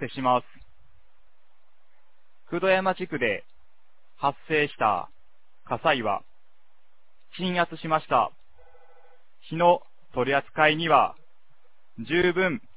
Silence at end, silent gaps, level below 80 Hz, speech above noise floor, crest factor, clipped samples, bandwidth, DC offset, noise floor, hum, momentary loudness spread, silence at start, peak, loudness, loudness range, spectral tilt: 0.2 s; none; -60 dBFS; 46 dB; 22 dB; under 0.1%; 4 kHz; 0.8%; -70 dBFS; none; 12 LU; 0 s; -4 dBFS; -25 LUFS; 5 LU; -9 dB/octave